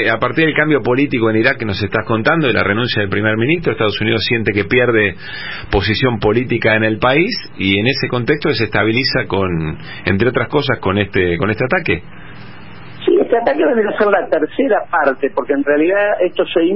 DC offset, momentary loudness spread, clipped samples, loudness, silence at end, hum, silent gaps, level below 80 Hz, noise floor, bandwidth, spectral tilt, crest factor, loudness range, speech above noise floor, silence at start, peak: 2%; 5 LU; under 0.1%; -15 LUFS; 0 s; none; none; -38 dBFS; -35 dBFS; 5.8 kHz; -10 dB/octave; 14 dB; 2 LU; 21 dB; 0 s; 0 dBFS